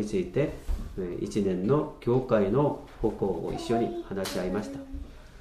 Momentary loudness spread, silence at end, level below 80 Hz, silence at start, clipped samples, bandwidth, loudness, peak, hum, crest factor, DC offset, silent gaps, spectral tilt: 12 LU; 0 s; -42 dBFS; 0 s; under 0.1%; 15 kHz; -29 LUFS; -10 dBFS; none; 18 dB; under 0.1%; none; -7 dB/octave